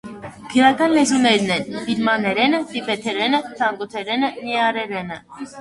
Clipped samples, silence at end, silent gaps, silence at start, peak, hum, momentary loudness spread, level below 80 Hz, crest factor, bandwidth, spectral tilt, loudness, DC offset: under 0.1%; 0 s; none; 0.05 s; 0 dBFS; none; 13 LU; -60 dBFS; 18 dB; 11.5 kHz; -3.5 dB/octave; -19 LUFS; under 0.1%